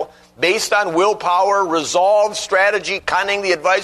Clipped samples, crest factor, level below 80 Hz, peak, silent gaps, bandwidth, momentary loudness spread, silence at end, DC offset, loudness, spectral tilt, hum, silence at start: under 0.1%; 14 dB; -56 dBFS; -2 dBFS; none; 13.5 kHz; 4 LU; 0 s; under 0.1%; -16 LUFS; -2 dB/octave; none; 0 s